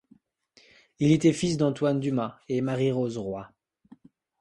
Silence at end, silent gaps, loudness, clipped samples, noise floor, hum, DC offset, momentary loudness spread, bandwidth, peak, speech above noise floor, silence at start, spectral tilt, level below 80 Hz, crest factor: 0.95 s; none; -26 LUFS; under 0.1%; -62 dBFS; none; under 0.1%; 11 LU; 11 kHz; -10 dBFS; 37 dB; 1 s; -6.5 dB/octave; -62 dBFS; 18 dB